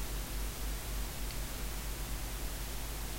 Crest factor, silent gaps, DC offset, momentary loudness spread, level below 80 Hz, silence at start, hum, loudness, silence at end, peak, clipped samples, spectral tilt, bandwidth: 12 dB; none; under 0.1%; 1 LU; -40 dBFS; 0 s; none; -40 LUFS; 0 s; -26 dBFS; under 0.1%; -3.5 dB/octave; 16 kHz